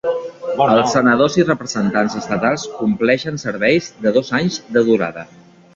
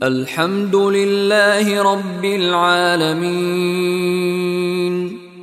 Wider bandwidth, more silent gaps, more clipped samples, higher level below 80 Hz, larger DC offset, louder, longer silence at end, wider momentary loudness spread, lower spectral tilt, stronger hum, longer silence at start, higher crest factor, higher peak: second, 7.8 kHz vs 15 kHz; neither; neither; first, -54 dBFS vs -62 dBFS; neither; about the same, -17 LUFS vs -16 LUFS; first, 0.5 s vs 0 s; first, 9 LU vs 6 LU; about the same, -5 dB/octave vs -5 dB/octave; neither; about the same, 0.05 s vs 0 s; about the same, 16 dB vs 14 dB; about the same, -2 dBFS vs -2 dBFS